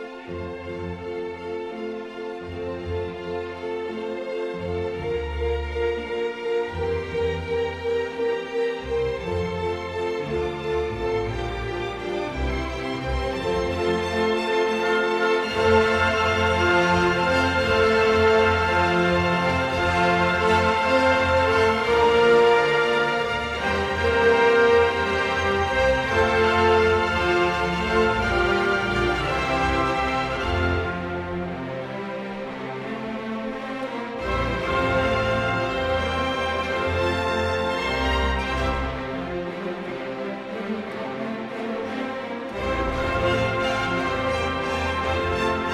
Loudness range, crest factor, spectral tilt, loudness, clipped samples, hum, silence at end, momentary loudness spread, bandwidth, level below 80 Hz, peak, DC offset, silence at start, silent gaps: 10 LU; 16 dB; -5.5 dB/octave; -23 LUFS; under 0.1%; none; 0 s; 12 LU; 12.5 kHz; -38 dBFS; -6 dBFS; under 0.1%; 0 s; none